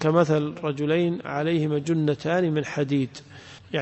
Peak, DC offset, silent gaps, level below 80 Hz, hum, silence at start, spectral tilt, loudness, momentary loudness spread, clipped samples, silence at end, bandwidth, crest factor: -8 dBFS; under 0.1%; none; -62 dBFS; none; 0 s; -7 dB/octave; -25 LUFS; 10 LU; under 0.1%; 0 s; 8.4 kHz; 16 dB